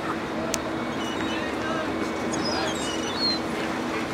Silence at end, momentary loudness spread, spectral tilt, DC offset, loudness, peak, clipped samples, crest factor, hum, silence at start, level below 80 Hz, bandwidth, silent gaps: 0 s; 5 LU; -3.5 dB/octave; under 0.1%; -27 LUFS; -4 dBFS; under 0.1%; 24 dB; none; 0 s; -50 dBFS; 16 kHz; none